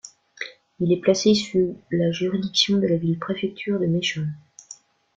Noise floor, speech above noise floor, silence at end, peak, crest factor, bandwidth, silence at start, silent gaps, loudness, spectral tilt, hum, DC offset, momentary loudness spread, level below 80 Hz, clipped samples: -48 dBFS; 26 dB; 0.45 s; -4 dBFS; 20 dB; 7.8 kHz; 0.05 s; none; -22 LUFS; -5 dB/octave; none; under 0.1%; 16 LU; -60 dBFS; under 0.1%